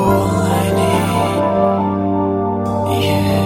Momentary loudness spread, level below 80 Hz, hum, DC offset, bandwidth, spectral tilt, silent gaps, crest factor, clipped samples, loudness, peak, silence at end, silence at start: 3 LU; -40 dBFS; none; under 0.1%; 16.5 kHz; -6.5 dB/octave; none; 12 dB; under 0.1%; -16 LUFS; -2 dBFS; 0 s; 0 s